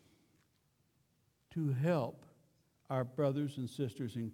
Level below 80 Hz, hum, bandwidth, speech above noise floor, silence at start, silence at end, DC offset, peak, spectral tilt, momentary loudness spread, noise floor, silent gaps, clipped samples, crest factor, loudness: -78 dBFS; none; 16 kHz; 40 dB; 1.5 s; 0 s; under 0.1%; -22 dBFS; -8 dB/octave; 8 LU; -76 dBFS; none; under 0.1%; 18 dB; -37 LUFS